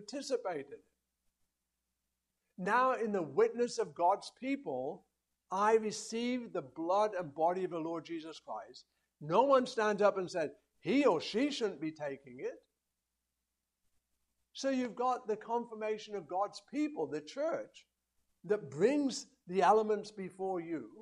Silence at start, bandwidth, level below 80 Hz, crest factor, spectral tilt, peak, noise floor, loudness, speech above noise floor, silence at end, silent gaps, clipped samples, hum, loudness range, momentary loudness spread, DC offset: 0 s; 11.5 kHz; -82 dBFS; 20 dB; -5 dB/octave; -14 dBFS; -88 dBFS; -35 LUFS; 53 dB; 0 s; none; under 0.1%; none; 7 LU; 14 LU; under 0.1%